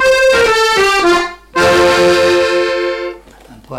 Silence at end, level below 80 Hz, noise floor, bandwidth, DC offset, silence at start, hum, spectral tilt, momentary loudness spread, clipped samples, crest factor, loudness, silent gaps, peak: 0 s; -38 dBFS; -39 dBFS; 16 kHz; under 0.1%; 0 s; none; -3 dB/octave; 9 LU; under 0.1%; 10 dB; -11 LUFS; none; -2 dBFS